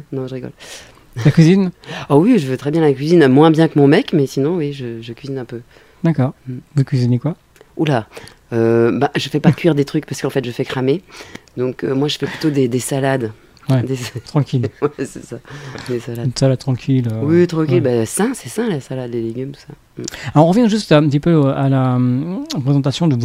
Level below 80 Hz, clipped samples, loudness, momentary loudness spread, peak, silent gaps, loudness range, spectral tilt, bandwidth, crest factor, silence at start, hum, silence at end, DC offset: -50 dBFS; under 0.1%; -16 LUFS; 17 LU; 0 dBFS; none; 7 LU; -7 dB/octave; 15.5 kHz; 16 dB; 0.1 s; none; 0 s; under 0.1%